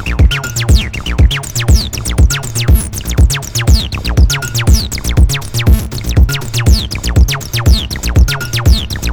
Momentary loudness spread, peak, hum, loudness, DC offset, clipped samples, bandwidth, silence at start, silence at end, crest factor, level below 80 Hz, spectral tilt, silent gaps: 3 LU; 0 dBFS; none; -13 LUFS; under 0.1%; 0.4%; over 20 kHz; 0 s; 0 s; 10 dB; -12 dBFS; -4.5 dB/octave; none